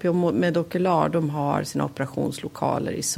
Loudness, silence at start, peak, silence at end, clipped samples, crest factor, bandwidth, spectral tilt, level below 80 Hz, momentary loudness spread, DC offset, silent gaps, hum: -24 LUFS; 0 s; -6 dBFS; 0 s; under 0.1%; 18 dB; 16 kHz; -5.5 dB/octave; -58 dBFS; 6 LU; under 0.1%; none; none